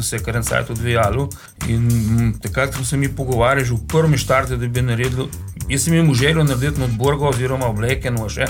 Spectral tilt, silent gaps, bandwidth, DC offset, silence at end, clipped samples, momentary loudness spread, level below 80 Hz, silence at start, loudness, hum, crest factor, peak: -5.5 dB/octave; none; 17.5 kHz; under 0.1%; 0 s; under 0.1%; 7 LU; -32 dBFS; 0 s; -18 LUFS; none; 14 dB; -4 dBFS